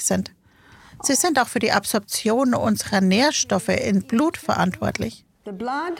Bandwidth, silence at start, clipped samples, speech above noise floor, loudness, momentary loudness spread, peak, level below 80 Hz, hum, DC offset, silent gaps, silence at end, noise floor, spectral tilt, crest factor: 17 kHz; 0 s; under 0.1%; 30 dB; -21 LUFS; 11 LU; -2 dBFS; -54 dBFS; none; under 0.1%; none; 0 s; -51 dBFS; -4 dB/octave; 20 dB